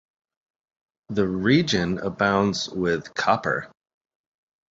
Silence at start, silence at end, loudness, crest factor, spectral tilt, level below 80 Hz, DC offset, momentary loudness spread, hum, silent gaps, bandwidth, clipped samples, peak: 1.1 s; 1.05 s; -23 LUFS; 20 dB; -5.5 dB/octave; -52 dBFS; under 0.1%; 7 LU; none; none; 7.8 kHz; under 0.1%; -4 dBFS